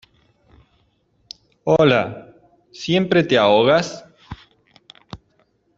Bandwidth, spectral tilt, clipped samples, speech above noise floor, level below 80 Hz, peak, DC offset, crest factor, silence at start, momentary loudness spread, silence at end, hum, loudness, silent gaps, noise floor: 7.8 kHz; -5.5 dB/octave; under 0.1%; 46 dB; -54 dBFS; -2 dBFS; under 0.1%; 18 dB; 1.65 s; 26 LU; 0.6 s; none; -17 LUFS; none; -63 dBFS